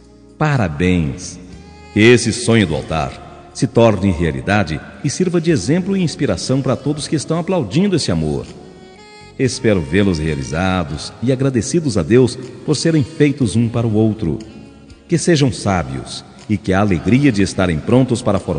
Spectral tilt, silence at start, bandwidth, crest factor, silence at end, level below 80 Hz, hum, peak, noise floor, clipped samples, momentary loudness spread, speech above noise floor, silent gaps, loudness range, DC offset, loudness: -6 dB/octave; 0.4 s; 10 kHz; 16 dB; 0 s; -40 dBFS; none; 0 dBFS; -39 dBFS; under 0.1%; 10 LU; 24 dB; none; 3 LU; under 0.1%; -16 LUFS